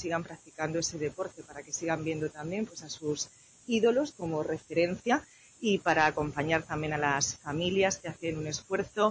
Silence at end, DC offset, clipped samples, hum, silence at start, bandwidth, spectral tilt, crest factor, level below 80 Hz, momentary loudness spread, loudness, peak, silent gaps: 0 s; under 0.1%; under 0.1%; none; 0 s; 8 kHz; -4 dB/octave; 20 dB; -60 dBFS; 10 LU; -31 LUFS; -12 dBFS; none